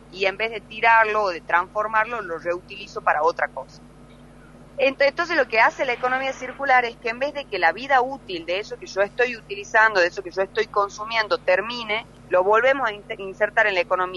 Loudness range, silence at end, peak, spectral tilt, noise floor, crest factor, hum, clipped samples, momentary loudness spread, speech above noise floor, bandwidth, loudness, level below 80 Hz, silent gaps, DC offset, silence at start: 3 LU; 0 s; -4 dBFS; -3.5 dB/octave; -46 dBFS; 18 dB; 50 Hz at -50 dBFS; under 0.1%; 11 LU; 24 dB; 11.5 kHz; -22 LUFS; -54 dBFS; none; under 0.1%; 0.1 s